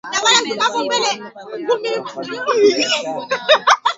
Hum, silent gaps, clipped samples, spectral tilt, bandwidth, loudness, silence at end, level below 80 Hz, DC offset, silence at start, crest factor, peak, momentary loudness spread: none; none; under 0.1%; -1 dB/octave; 8 kHz; -16 LUFS; 0 s; -68 dBFS; under 0.1%; 0.05 s; 18 dB; 0 dBFS; 13 LU